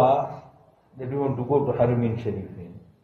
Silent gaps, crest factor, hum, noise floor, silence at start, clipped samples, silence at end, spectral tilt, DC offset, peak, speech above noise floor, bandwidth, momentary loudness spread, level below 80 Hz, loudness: none; 18 dB; none; -54 dBFS; 0 s; under 0.1%; 0.25 s; -10 dB/octave; under 0.1%; -6 dBFS; 29 dB; 6.2 kHz; 19 LU; -56 dBFS; -25 LUFS